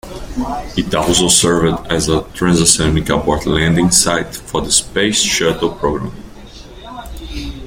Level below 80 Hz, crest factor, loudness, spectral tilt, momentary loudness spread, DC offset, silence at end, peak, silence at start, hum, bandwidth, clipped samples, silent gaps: -30 dBFS; 16 dB; -14 LUFS; -3.5 dB/octave; 17 LU; under 0.1%; 0 s; 0 dBFS; 0.05 s; none; 17 kHz; under 0.1%; none